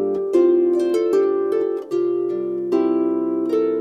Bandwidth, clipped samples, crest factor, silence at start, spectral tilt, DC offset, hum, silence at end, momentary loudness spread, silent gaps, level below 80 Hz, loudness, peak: 9 kHz; under 0.1%; 12 dB; 0 s; -7 dB/octave; under 0.1%; none; 0 s; 6 LU; none; -68 dBFS; -20 LUFS; -6 dBFS